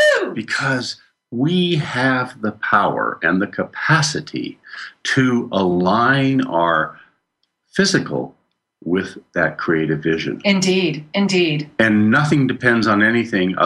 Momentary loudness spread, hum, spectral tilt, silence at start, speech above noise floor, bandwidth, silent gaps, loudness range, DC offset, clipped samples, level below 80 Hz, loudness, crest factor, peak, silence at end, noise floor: 11 LU; none; -5 dB/octave; 0 s; 53 dB; 12 kHz; none; 5 LU; under 0.1%; under 0.1%; -56 dBFS; -18 LUFS; 16 dB; -2 dBFS; 0 s; -71 dBFS